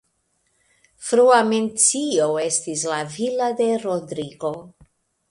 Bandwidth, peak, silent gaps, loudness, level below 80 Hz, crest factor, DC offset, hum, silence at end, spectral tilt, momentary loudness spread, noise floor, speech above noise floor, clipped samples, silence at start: 11.5 kHz; -2 dBFS; none; -20 LUFS; -66 dBFS; 20 dB; under 0.1%; none; 0.6 s; -3 dB/octave; 14 LU; -69 dBFS; 49 dB; under 0.1%; 1 s